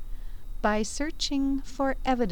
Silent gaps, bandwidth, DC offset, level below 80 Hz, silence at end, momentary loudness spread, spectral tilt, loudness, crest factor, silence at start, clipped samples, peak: none; 18 kHz; 1%; -36 dBFS; 0 s; 18 LU; -4 dB/octave; -29 LUFS; 16 dB; 0 s; under 0.1%; -12 dBFS